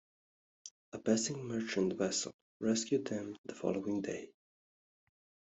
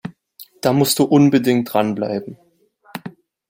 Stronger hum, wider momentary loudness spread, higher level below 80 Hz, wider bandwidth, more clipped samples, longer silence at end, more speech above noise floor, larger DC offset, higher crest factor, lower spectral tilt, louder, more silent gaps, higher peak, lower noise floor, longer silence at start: neither; second, 17 LU vs 22 LU; second, -78 dBFS vs -60 dBFS; second, 8.2 kHz vs 16.5 kHz; neither; first, 1.25 s vs 0.4 s; first, over 54 dB vs 38 dB; neither; about the same, 22 dB vs 18 dB; second, -4 dB/octave vs -5.5 dB/octave; second, -36 LUFS vs -17 LUFS; first, 0.71-0.92 s, 2.34-2.60 s, 3.38-3.44 s vs none; second, -16 dBFS vs -2 dBFS; first, under -90 dBFS vs -54 dBFS; first, 0.65 s vs 0.05 s